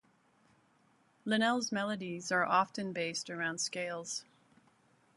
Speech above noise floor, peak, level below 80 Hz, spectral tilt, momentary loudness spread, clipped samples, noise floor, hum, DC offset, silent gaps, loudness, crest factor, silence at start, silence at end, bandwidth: 36 dB; -16 dBFS; -82 dBFS; -3 dB/octave; 10 LU; under 0.1%; -70 dBFS; none; under 0.1%; none; -34 LUFS; 20 dB; 1.25 s; 0.95 s; 11.5 kHz